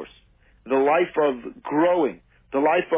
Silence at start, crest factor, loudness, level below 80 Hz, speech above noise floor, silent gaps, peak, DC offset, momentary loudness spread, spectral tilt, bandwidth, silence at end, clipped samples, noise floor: 0 s; 14 dB; -22 LUFS; -60 dBFS; 35 dB; none; -8 dBFS; under 0.1%; 9 LU; -9.5 dB/octave; 3.8 kHz; 0 s; under 0.1%; -57 dBFS